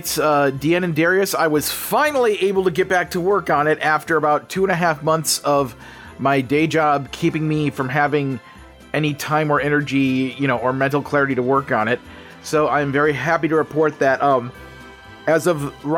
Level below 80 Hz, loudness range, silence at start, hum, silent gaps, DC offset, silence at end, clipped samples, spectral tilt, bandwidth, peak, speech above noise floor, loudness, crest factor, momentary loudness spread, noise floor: -52 dBFS; 2 LU; 0 s; none; none; under 0.1%; 0 s; under 0.1%; -5 dB/octave; 19 kHz; -4 dBFS; 22 dB; -19 LUFS; 14 dB; 5 LU; -40 dBFS